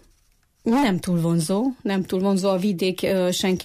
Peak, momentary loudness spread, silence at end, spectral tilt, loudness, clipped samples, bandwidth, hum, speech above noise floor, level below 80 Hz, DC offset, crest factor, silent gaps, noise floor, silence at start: -10 dBFS; 3 LU; 0 s; -5.5 dB/octave; -22 LUFS; under 0.1%; 15.5 kHz; none; 40 dB; -54 dBFS; under 0.1%; 12 dB; none; -62 dBFS; 0.65 s